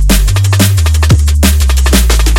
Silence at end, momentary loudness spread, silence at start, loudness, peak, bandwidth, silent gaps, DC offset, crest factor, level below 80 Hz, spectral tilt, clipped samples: 0 s; 1 LU; 0 s; -9 LUFS; 0 dBFS; 18.5 kHz; none; under 0.1%; 8 dB; -10 dBFS; -4.5 dB/octave; 0.4%